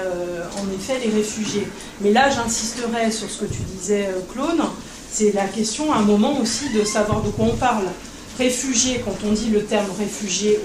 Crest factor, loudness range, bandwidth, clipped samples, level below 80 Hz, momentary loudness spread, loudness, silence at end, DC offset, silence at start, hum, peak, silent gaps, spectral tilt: 18 dB; 2 LU; 14.5 kHz; under 0.1%; -42 dBFS; 10 LU; -21 LUFS; 0 s; under 0.1%; 0 s; none; -4 dBFS; none; -4 dB/octave